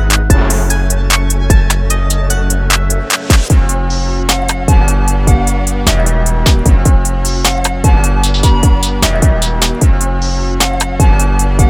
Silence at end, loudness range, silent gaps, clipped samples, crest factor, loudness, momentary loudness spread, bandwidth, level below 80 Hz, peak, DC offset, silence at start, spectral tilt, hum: 0 s; 1 LU; none; under 0.1%; 10 dB; -12 LUFS; 4 LU; 17 kHz; -12 dBFS; 0 dBFS; under 0.1%; 0 s; -4.5 dB/octave; none